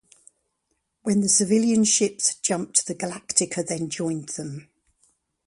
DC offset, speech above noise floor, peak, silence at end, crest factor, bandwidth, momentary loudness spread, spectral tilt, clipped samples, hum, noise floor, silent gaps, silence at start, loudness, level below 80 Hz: under 0.1%; 52 dB; -4 dBFS; 0.85 s; 22 dB; 11.5 kHz; 14 LU; -3.5 dB/octave; under 0.1%; none; -75 dBFS; none; 1.05 s; -22 LUFS; -66 dBFS